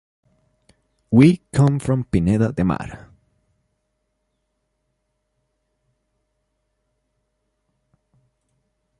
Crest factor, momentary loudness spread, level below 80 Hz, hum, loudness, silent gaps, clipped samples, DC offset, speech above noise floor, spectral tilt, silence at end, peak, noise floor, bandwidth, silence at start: 22 dB; 9 LU; -44 dBFS; none; -18 LUFS; none; under 0.1%; under 0.1%; 56 dB; -8 dB/octave; 6.05 s; -2 dBFS; -73 dBFS; 11.5 kHz; 1.1 s